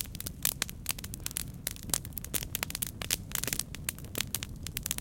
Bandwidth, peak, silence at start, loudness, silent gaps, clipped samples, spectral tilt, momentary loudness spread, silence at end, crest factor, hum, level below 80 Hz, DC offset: 17.5 kHz; -4 dBFS; 0 s; -34 LUFS; none; under 0.1%; -2 dB/octave; 6 LU; 0 s; 32 dB; none; -48 dBFS; under 0.1%